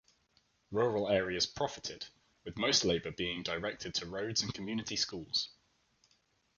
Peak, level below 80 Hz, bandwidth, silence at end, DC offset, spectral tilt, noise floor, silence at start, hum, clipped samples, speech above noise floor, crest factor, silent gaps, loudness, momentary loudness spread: -16 dBFS; -62 dBFS; 10 kHz; 1.05 s; under 0.1%; -3 dB/octave; -74 dBFS; 0.7 s; none; under 0.1%; 39 dB; 20 dB; none; -34 LUFS; 13 LU